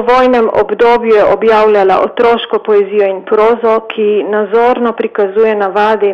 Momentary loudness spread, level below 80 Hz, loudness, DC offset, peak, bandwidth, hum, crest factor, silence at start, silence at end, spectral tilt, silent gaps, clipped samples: 5 LU; -46 dBFS; -10 LUFS; under 0.1%; -2 dBFS; 6.6 kHz; none; 6 dB; 0 s; 0 s; -6 dB/octave; none; under 0.1%